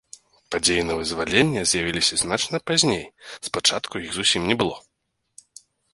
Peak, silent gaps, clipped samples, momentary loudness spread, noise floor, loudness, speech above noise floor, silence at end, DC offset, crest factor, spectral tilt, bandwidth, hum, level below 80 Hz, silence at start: -2 dBFS; none; under 0.1%; 10 LU; -75 dBFS; -21 LUFS; 53 dB; 1.15 s; under 0.1%; 22 dB; -2.5 dB/octave; 11.5 kHz; none; -50 dBFS; 0.5 s